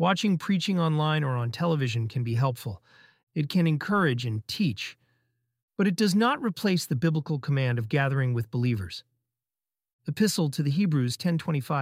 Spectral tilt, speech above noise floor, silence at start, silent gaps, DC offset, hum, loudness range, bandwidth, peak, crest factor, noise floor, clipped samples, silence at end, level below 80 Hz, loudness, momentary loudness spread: -6 dB/octave; over 64 dB; 0 s; 3.23-3.27 s, 5.63-5.68 s, 9.93-9.99 s; under 0.1%; none; 2 LU; 16 kHz; -8 dBFS; 18 dB; under -90 dBFS; under 0.1%; 0 s; -64 dBFS; -27 LUFS; 11 LU